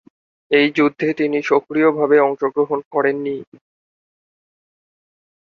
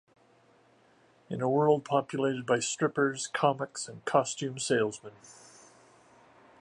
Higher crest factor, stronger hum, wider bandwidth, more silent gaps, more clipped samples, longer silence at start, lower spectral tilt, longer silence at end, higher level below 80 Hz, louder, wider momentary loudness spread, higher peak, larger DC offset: about the same, 18 dB vs 22 dB; neither; second, 6.8 kHz vs 11.5 kHz; first, 2.86-2.91 s vs none; neither; second, 0.5 s vs 1.3 s; first, -6.5 dB/octave vs -4.5 dB/octave; first, 2 s vs 1.3 s; first, -66 dBFS vs -76 dBFS; first, -17 LUFS vs -29 LUFS; second, 6 LU vs 11 LU; first, -2 dBFS vs -8 dBFS; neither